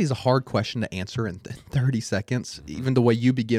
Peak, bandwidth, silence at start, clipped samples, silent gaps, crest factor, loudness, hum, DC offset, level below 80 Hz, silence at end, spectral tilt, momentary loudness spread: -6 dBFS; 11.5 kHz; 0 s; under 0.1%; none; 16 dB; -25 LUFS; none; under 0.1%; -54 dBFS; 0 s; -6.5 dB/octave; 10 LU